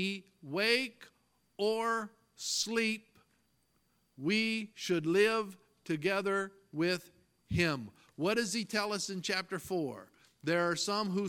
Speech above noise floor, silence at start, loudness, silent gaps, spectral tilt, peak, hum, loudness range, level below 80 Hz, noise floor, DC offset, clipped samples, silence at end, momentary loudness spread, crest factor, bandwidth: 41 dB; 0 s; -33 LUFS; none; -4 dB/octave; -14 dBFS; none; 2 LU; -66 dBFS; -75 dBFS; under 0.1%; under 0.1%; 0 s; 12 LU; 20 dB; 17 kHz